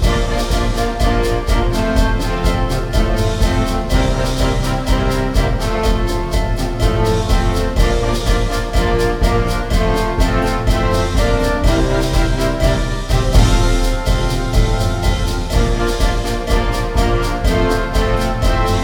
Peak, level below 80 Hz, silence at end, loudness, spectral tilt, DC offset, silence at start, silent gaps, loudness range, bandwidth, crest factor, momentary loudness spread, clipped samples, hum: 0 dBFS; -18 dBFS; 0 s; -17 LUFS; -5.5 dB/octave; under 0.1%; 0 s; none; 1 LU; 17 kHz; 14 dB; 2 LU; under 0.1%; none